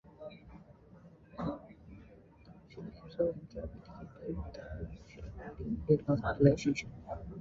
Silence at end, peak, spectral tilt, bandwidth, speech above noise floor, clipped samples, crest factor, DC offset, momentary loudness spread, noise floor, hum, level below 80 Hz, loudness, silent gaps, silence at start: 0 s; -12 dBFS; -7.5 dB/octave; 7.4 kHz; 26 dB; under 0.1%; 26 dB; under 0.1%; 26 LU; -58 dBFS; none; -52 dBFS; -35 LUFS; none; 0.05 s